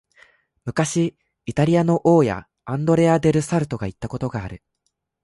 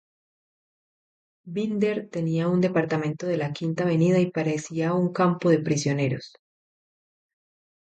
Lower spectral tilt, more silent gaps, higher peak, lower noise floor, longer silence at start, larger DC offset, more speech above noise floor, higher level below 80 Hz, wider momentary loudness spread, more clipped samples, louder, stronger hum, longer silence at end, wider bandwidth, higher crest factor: about the same, -7 dB/octave vs -6.5 dB/octave; neither; first, -4 dBFS vs -8 dBFS; second, -74 dBFS vs under -90 dBFS; second, 0.65 s vs 1.45 s; neither; second, 55 dB vs over 66 dB; first, -48 dBFS vs -68 dBFS; first, 15 LU vs 7 LU; neither; first, -20 LUFS vs -25 LUFS; neither; second, 0.65 s vs 1.65 s; first, 11.5 kHz vs 8.8 kHz; about the same, 16 dB vs 18 dB